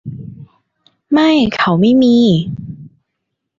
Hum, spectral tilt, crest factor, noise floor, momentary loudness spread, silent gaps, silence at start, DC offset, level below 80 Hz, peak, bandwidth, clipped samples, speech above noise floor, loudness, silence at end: none; -7 dB/octave; 12 dB; -74 dBFS; 22 LU; none; 0.05 s; under 0.1%; -48 dBFS; -2 dBFS; 7.4 kHz; under 0.1%; 64 dB; -12 LUFS; 0.7 s